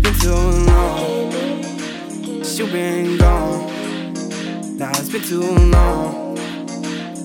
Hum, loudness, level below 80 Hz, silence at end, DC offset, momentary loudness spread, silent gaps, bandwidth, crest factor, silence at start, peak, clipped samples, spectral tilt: none; -19 LUFS; -20 dBFS; 0 s; under 0.1%; 11 LU; none; 18 kHz; 16 dB; 0 s; 0 dBFS; under 0.1%; -5.5 dB/octave